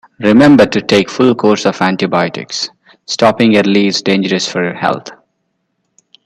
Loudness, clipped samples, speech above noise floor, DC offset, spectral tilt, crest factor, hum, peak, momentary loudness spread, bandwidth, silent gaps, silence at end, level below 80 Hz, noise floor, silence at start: -11 LUFS; under 0.1%; 56 dB; under 0.1%; -5 dB/octave; 12 dB; none; 0 dBFS; 12 LU; 11.5 kHz; none; 1.1 s; -50 dBFS; -67 dBFS; 0.2 s